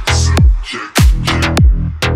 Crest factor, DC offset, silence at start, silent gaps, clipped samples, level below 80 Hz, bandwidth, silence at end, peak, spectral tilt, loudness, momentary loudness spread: 10 dB; under 0.1%; 0 s; none; under 0.1%; -14 dBFS; 16 kHz; 0 s; 0 dBFS; -4.5 dB/octave; -13 LUFS; 5 LU